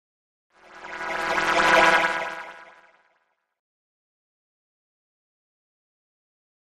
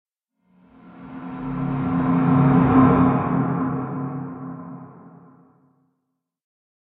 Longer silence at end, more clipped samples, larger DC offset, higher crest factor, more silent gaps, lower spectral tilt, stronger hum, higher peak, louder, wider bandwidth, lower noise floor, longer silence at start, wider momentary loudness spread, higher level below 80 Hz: first, 4 s vs 1.9 s; neither; neither; about the same, 22 dB vs 18 dB; neither; second, -2 dB/octave vs -12.5 dB/octave; neither; about the same, -6 dBFS vs -4 dBFS; about the same, -20 LUFS vs -20 LUFS; first, 13 kHz vs 3.9 kHz; second, -71 dBFS vs -77 dBFS; about the same, 0.75 s vs 0.85 s; about the same, 22 LU vs 22 LU; second, -58 dBFS vs -44 dBFS